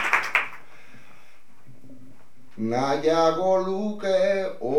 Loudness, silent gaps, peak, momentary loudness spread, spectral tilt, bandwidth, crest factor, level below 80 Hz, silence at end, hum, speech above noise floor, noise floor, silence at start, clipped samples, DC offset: -24 LUFS; none; -4 dBFS; 7 LU; -5 dB/octave; 16 kHz; 22 dB; -74 dBFS; 0 s; none; 34 dB; -57 dBFS; 0 s; under 0.1%; 2%